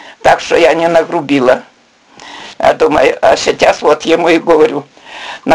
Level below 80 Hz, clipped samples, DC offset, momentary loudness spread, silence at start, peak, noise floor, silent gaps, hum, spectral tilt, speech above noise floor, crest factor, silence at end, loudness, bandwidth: -44 dBFS; 0.3%; 0.3%; 17 LU; 0.05 s; 0 dBFS; -43 dBFS; none; none; -4 dB/octave; 33 dB; 10 dB; 0 s; -10 LUFS; 11.5 kHz